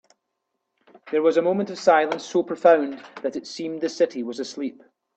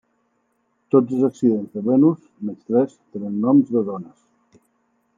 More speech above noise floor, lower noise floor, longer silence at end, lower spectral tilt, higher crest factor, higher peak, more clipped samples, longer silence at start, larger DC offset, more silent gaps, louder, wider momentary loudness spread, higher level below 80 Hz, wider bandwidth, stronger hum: first, 56 dB vs 49 dB; first, -79 dBFS vs -68 dBFS; second, 0.45 s vs 1.1 s; second, -5 dB/octave vs -10.5 dB/octave; about the same, 20 dB vs 18 dB; about the same, -4 dBFS vs -2 dBFS; neither; about the same, 1.05 s vs 0.95 s; neither; neither; second, -23 LUFS vs -20 LUFS; about the same, 13 LU vs 14 LU; about the same, -74 dBFS vs -72 dBFS; first, 8.4 kHz vs 7.6 kHz; neither